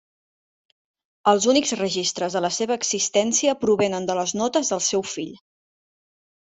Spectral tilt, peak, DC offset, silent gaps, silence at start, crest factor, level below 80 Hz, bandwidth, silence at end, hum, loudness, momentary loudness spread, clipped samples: -2.5 dB/octave; -4 dBFS; under 0.1%; none; 1.25 s; 18 dB; -64 dBFS; 8.4 kHz; 1.15 s; none; -22 LUFS; 5 LU; under 0.1%